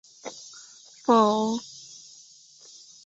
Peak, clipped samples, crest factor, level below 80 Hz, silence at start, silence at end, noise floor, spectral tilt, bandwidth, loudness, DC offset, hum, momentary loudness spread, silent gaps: -8 dBFS; under 0.1%; 20 dB; -74 dBFS; 0.25 s; 1.25 s; -52 dBFS; -4.5 dB/octave; 8 kHz; -23 LUFS; under 0.1%; none; 27 LU; none